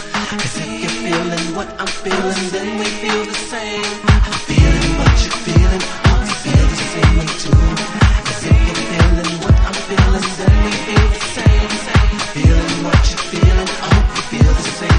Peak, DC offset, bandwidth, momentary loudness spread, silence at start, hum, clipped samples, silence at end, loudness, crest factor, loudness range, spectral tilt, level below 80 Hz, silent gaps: 0 dBFS; under 0.1%; 10.5 kHz; 7 LU; 0 s; none; under 0.1%; 0 s; -15 LUFS; 14 dB; 4 LU; -5 dB/octave; -16 dBFS; none